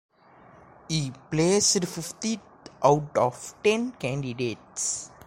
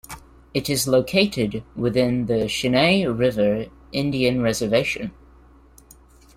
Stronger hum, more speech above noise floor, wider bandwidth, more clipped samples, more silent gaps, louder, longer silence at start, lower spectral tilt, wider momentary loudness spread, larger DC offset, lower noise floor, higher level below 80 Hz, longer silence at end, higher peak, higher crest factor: neither; about the same, 28 dB vs 29 dB; about the same, 16 kHz vs 16.5 kHz; neither; neither; second, -26 LUFS vs -21 LUFS; first, 0.9 s vs 0.1 s; about the same, -4 dB/octave vs -5 dB/octave; about the same, 10 LU vs 11 LU; neither; first, -54 dBFS vs -50 dBFS; second, -58 dBFS vs -48 dBFS; second, 0.2 s vs 1.25 s; about the same, -6 dBFS vs -4 dBFS; about the same, 20 dB vs 18 dB